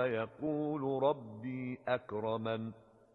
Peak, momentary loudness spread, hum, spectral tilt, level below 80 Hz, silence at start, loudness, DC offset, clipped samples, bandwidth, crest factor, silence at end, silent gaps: -18 dBFS; 8 LU; none; -9.5 dB/octave; -72 dBFS; 0 s; -37 LUFS; under 0.1%; under 0.1%; 4.3 kHz; 20 dB; 0.35 s; none